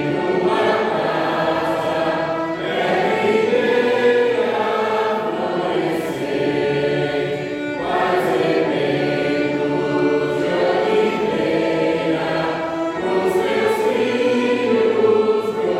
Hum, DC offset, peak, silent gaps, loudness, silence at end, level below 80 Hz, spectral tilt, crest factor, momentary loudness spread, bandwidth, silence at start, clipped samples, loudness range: none; under 0.1%; -6 dBFS; none; -19 LUFS; 0 s; -56 dBFS; -6 dB/octave; 14 dB; 5 LU; 14 kHz; 0 s; under 0.1%; 2 LU